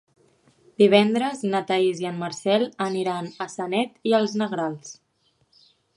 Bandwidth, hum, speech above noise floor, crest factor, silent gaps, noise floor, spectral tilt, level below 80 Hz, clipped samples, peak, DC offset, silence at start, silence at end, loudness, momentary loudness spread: 11.5 kHz; none; 45 dB; 22 dB; none; -67 dBFS; -5 dB/octave; -72 dBFS; under 0.1%; -2 dBFS; under 0.1%; 0.8 s; 1.05 s; -23 LUFS; 13 LU